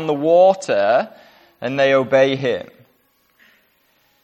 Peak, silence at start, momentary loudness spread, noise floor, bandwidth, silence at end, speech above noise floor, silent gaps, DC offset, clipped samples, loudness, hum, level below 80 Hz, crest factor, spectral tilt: -2 dBFS; 0 s; 14 LU; -61 dBFS; 8.8 kHz; 1.6 s; 45 dB; none; under 0.1%; under 0.1%; -16 LUFS; none; -68 dBFS; 16 dB; -5.5 dB/octave